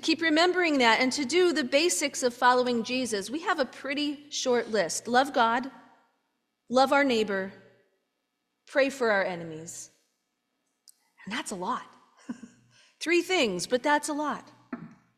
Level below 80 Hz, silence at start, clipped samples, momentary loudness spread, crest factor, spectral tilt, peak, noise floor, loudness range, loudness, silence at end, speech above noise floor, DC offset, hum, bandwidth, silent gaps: -72 dBFS; 0 s; under 0.1%; 17 LU; 22 dB; -2.5 dB/octave; -6 dBFS; -80 dBFS; 9 LU; -26 LUFS; 0.3 s; 53 dB; under 0.1%; none; 15.5 kHz; none